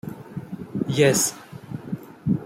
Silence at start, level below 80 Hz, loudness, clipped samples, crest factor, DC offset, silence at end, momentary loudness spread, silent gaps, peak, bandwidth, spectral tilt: 0.05 s; -58 dBFS; -23 LUFS; under 0.1%; 20 dB; under 0.1%; 0 s; 19 LU; none; -4 dBFS; 16.5 kHz; -4.5 dB/octave